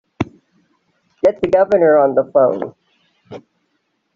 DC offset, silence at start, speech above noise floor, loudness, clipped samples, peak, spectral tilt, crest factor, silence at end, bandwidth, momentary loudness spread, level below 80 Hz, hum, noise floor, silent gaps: under 0.1%; 0.2 s; 55 dB; -15 LUFS; under 0.1%; -2 dBFS; -6 dB/octave; 14 dB; 0.75 s; 7 kHz; 15 LU; -54 dBFS; none; -68 dBFS; none